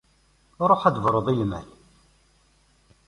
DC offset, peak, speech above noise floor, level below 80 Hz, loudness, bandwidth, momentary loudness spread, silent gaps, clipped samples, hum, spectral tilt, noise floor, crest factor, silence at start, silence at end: under 0.1%; -4 dBFS; 40 dB; -52 dBFS; -22 LUFS; 11.5 kHz; 10 LU; none; under 0.1%; none; -8 dB/octave; -62 dBFS; 22 dB; 0.6 s; 1.45 s